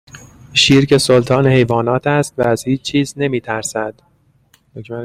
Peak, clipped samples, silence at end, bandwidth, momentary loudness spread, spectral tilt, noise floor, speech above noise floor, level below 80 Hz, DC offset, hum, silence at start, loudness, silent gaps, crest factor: 0 dBFS; under 0.1%; 0 s; 15.5 kHz; 11 LU; -5 dB/octave; -55 dBFS; 40 dB; -46 dBFS; under 0.1%; none; 0.15 s; -14 LUFS; none; 16 dB